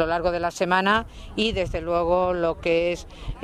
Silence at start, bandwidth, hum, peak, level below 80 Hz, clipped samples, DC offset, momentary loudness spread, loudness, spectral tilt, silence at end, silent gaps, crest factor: 0 s; 13 kHz; none; -6 dBFS; -38 dBFS; under 0.1%; under 0.1%; 7 LU; -23 LUFS; -5 dB/octave; 0 s; none; 18 dB